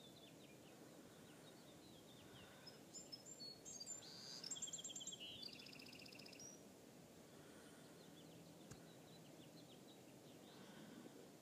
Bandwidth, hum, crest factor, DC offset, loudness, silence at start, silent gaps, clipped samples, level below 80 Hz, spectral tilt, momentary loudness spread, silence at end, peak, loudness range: 15.5 kHz; none; 22 dB; under 0.1%; -57 LUFS; 0 s; none; under 0.1%; -88 dBFS; -2 dB/octave; 12 LU; 0 s; -38 dBFS; 10 LU